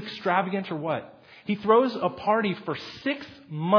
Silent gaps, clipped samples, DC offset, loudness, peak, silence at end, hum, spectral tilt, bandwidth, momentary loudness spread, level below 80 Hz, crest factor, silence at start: none; under 0.1%; under 0.1%; -26 LUFS; -6 dBFS; 0 s; none; -7.5 dB/octave; 5.4 kHz; 12 LU; -68 dBFS; 20 dB; 0 s